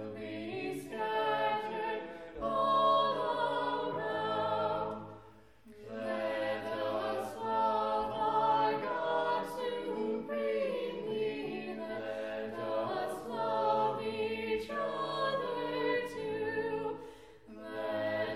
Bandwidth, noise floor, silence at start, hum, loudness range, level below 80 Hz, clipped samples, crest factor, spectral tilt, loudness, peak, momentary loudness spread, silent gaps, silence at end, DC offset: 14.5 kHz; -58 dBFS; 0 s; none; 4 LU; -66 dBFS; under 0.1%; 16 dB; -5.5 dB/octave; -34 LUFS; -18 dBFS; 10 LU; none; 0 s; under 0.1%